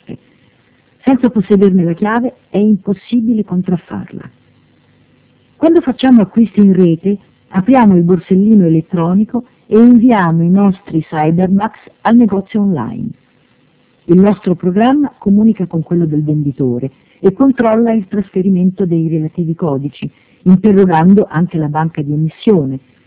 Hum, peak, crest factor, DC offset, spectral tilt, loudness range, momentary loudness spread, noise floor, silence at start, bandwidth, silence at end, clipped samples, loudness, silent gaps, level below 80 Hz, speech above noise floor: none; 0 dBFS; 12 dB; under 0.1%; -12.5 dB/octave; 5 LU; 10 LU; -52 dBFS; 0.1 s; 4 kHz; 0.3 s; 0.5%; -12 LUFS; none; -46 dBFS; 41 dB